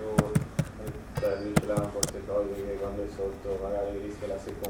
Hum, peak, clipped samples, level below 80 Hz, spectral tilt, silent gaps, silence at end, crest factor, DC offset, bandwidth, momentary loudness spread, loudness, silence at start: none; -6 dBFS; under 0.1%; -46 dBFS; -5.5 dB/octave; none; 0 s; 26 dB; under 0.1%; 17.5 kHz; 8 LU; -32 LUFS; 0 s